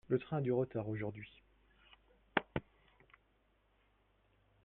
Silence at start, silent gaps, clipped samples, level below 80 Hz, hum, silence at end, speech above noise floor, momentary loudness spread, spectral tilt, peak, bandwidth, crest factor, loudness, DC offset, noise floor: 0.1 s; none; under 0.1%; -68 dBFS; none; 2.05 s; 37 dB; 11 LU; -9.5 dB/octave; -12 dBFS; 4.1 kHz; 30 dB; -39 LUFS; under 0.1%; -75 dBFS